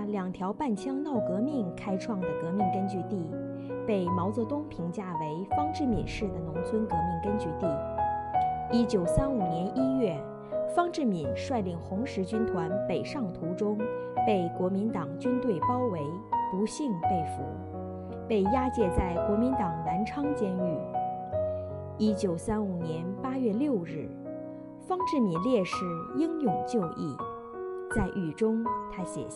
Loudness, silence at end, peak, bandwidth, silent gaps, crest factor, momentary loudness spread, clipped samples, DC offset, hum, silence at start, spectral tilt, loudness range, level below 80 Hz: -31 LUFS; 0 s; -12 dBFS; 11.5 kHz; none; 18 dB; 8 LU; under 0.1%; under 0.1%; none; 0 s; -7.5 dB/octave; 3 LU; -50 dBFS